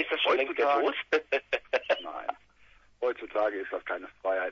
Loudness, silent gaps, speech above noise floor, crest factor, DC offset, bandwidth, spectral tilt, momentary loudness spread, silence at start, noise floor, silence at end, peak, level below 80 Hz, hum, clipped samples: -30 LUFS; none; 30 dB; 20 dB; under 0.1%; 7.2 kHz; -3 dB/octave; 10 LU; 0 s; -59 dBFS; 0 s; -10 dBFS; -68 dBFS; none; under 0.1%